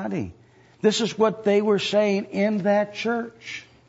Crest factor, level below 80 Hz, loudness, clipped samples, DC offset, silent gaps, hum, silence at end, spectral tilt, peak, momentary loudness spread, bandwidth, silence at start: 16 dB; -62 dBFS; -23 LUFS; under 0.1%; under 0.1%; none; none; 0.25 s; -5 dB/octave; -6 dBFS; 13 LU; 8 kHz; 0 s